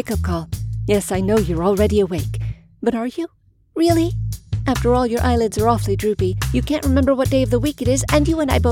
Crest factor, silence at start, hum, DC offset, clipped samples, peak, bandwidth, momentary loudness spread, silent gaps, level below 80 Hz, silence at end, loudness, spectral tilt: 16 dB; 0 s; none; under 0.1%; under 0.1%; -2 dBFS; 17 kHz; 9 LU; none; -30 dBFS; 0 s; -19 LUFS; -6 dB/octave